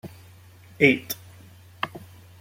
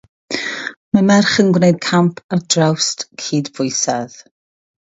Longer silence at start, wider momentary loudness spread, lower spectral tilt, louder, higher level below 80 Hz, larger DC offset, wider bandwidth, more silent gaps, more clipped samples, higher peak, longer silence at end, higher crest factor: second, 0.05 s vs 0.3 s; first, 23 LU vs 12 LU; about the same, -5 dB/octave vs -4.5 dB/octave; second, -24 LUFS vs -16 LUFS; second, -64 dBFS vs -58 dBFS; neither; first, 16.5 kHz vs 8 kHz; second, none vs 0.77-0.92 s, 2.24-2.29 s; neither; about the same, -2 dBFS vs 0 dBFS; second, 0.45 s vs 0.65 s; first, 26 dB vs 16 dB